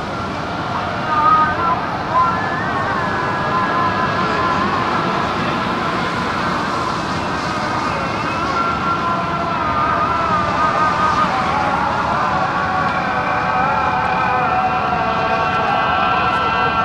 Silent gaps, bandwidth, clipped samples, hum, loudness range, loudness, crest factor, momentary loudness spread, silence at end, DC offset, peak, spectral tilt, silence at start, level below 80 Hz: none; 13 kHz; under 0.1%; none; 3 LU; -17 LUFS; 14 dB; 4 LU; 0 s; under 0.1%; -4 dBFS; -5.5 dB/octave; 0 s; -40 dBFS